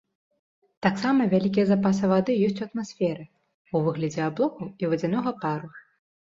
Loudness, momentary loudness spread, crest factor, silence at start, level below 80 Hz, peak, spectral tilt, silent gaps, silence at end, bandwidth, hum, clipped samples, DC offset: -25 LUFS; 9 LU; 20 dB; 0.8 s; -64 dBFS; -6 dBFS; -7.5 dB/octave; 3.54-3.65 s; 0.6 s; 7.6 kHz; none; under 0.1%; under 0.1%